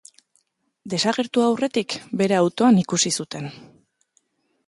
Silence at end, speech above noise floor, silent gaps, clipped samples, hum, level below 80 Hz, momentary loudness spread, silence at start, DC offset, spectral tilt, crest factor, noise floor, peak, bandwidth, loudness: 1.05 s; 47 dB; none; under 0.1%; none; -66 dBFS; 12 LU; 0.85 s; under 0.1%; -4.5 dB/octave; 18 dB; -67 dBFS; -4 dBFS; 11.5 kHz; -21 LUFS